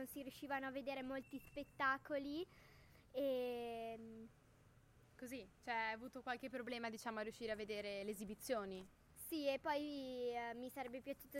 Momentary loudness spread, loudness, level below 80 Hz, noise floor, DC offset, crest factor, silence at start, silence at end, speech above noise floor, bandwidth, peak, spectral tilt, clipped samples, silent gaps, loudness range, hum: 13 LU; -46 LUFS; -74 dBFS; -70 dBFS; under 0.1%; 18 dB; 0 s; 0 s; 23 dB; 16.5 kHz; -28 dBFS; -4 dB/octave; under 0.1%; none; 4 LU; none